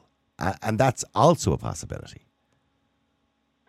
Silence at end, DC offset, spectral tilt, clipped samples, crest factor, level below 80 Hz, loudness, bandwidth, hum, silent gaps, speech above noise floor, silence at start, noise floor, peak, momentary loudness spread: 1.55 s; under 0.1%; -5.5 dB/octave; under 0.1%; 20 dB; -48 dBFS; -24 LUFS; 15 kHz; none; none; 48 dB; 0.4 s; -72 dBFS; -6 dBFS; 16 LU